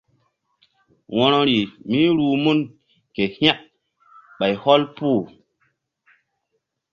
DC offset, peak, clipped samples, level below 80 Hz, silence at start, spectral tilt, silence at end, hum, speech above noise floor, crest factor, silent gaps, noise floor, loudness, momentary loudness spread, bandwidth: under 0.1%; 0 dBFS; under 0.1%; -60 dBFS; 1.1 s; -7 dB/octave; 1.65 s; none; 56 dB; 22 dB; none; -75 dBFS; -19 LUFS; 11 LU; 7 kHz